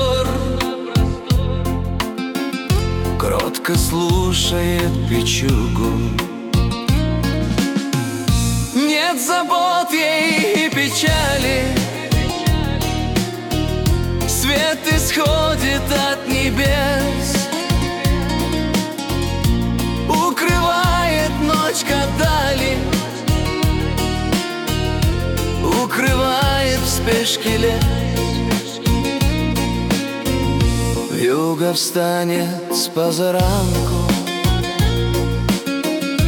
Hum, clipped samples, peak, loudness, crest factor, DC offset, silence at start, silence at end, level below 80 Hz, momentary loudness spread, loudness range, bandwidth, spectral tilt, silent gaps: none; under 0.1%; -4 dBFS; -18 LUFS; 14 dB; under 0.1%; 0 s; 0 s; -26 dBFS; 5 LU; 2 LU; 18 kHz; -4.5 dB/octave; none